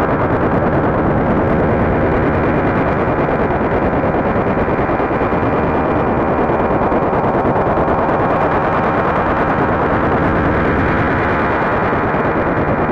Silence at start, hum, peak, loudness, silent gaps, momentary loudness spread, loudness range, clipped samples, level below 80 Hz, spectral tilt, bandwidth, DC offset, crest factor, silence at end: 0 s; none; -4 dBFS; -15 LUFS; none; 1 LU; 1 LU; under 0.1%; -28 dBFS; -9.5 dB/octave; 7.4 kHz; under 0.1%; 10 dB; 0 s